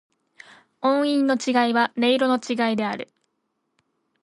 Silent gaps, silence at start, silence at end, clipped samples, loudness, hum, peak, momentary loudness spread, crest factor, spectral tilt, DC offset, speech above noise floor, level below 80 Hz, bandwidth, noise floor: none; 0.8 s; 1.2 s; under 0.1%; -22 LUFS; none; -8 dBFS; 8 LU; 16 dB; -4 dB/octave; under 0.1%; 54 dB; -74 dBFS; 11.5 kHz; -75 dBFS